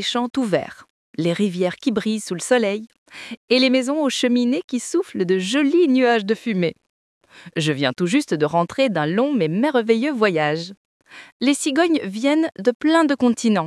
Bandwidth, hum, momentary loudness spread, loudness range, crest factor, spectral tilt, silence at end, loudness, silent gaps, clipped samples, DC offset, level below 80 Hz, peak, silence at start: 12 kHz; none; 8 LU; 2 LU; 18 dB; -5 dB/octave; 0 s; -20 LUFS; 0.90-1.14 s, 2.98-3.06 s, 3.37-3.48 s, 4.64-4.68 s, 6.89-7.21 s, 10.77-11.00 s, 11.32-11.40 s, 12.75-12.80 s; under 0.1%; under 0.1%; -68 dBFS; -2 dBFS; 0 s